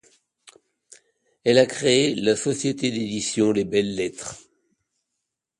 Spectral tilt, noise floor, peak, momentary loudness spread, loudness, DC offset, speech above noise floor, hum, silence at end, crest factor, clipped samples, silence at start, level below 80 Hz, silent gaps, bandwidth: -4 dB/octave; -82 dBFS; -4 dBFS; 10 LU; -22 LUFS; under 0.1%; 60 dB; none; 1.2 s; 20 dB; under 0.1%; 1.45 s; -60 dBFS; none; 11.5 kHz